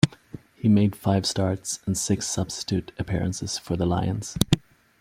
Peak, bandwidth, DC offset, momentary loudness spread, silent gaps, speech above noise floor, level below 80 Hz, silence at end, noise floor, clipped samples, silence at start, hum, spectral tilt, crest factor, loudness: -2 dBFS; 16.5 kHz; under 0.1%; 8 LU; none; 20 dB; -48 dBFS; 0.4 s; -44 dBFS; under 0.1%; 0.05 s; none; -5 dB/octave; 24 dB; -25 LUFS